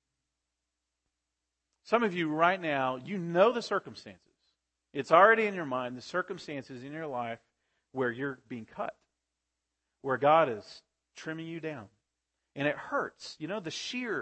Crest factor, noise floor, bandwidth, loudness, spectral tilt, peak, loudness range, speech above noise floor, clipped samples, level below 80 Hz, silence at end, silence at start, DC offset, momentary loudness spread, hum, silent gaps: 24 dB; -86 dBFS; 8.6 kHz; -30 LUFS; -5 dB/octave; -8 dBFS; 10 LU; 56 dB; under 0.1%; -78 dBFS; 0 s; 1.9 s; under 0.1%; 18 LU; none; none